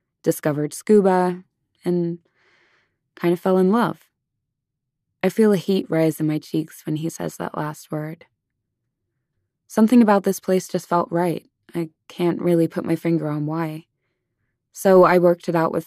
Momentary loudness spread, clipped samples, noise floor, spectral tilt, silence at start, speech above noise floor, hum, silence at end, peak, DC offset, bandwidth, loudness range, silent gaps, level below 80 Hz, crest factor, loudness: 15 LU; under 0.1%; -80 dBFS; -7 dB/octave; 0.25 s; 61 dB; none; 0.05 s; -4 dBFS; under 0.1%; 14.5 kHz; 5 LU; none; -68 dBFS; 18 dB; -20 LUFS